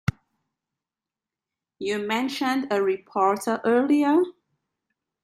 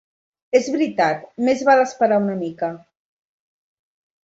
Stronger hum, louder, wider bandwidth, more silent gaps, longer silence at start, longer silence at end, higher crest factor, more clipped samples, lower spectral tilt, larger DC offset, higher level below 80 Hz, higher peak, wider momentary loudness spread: neither; second, -24 LUFS vs -19 LUFS; first, 15 kHz vs 8 kHz; neither; first, 1.8 s vs 0.55 s; second, 0.95 s vs 1.45 s; about the same, 16 dB vs 18 dB; neither; about the same, -5.5 dB/octave vs -5.5 dB/octave; neither; first, -60 dBFS vs -66 dBFS; second, -10 dBFS vs -2 dBFS; about the same, 10 LU vs 10 LU